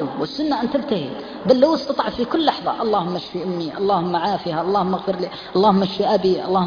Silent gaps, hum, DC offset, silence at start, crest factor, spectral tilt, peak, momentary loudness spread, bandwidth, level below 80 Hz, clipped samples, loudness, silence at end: none; none; under 0.1%; 0 s; 18 dB; -7 dB/octave; -2 dBFS; 9 LU; 5.2 kHz; -54 dBFS; under 0.1%; -20 LUFS; 0 s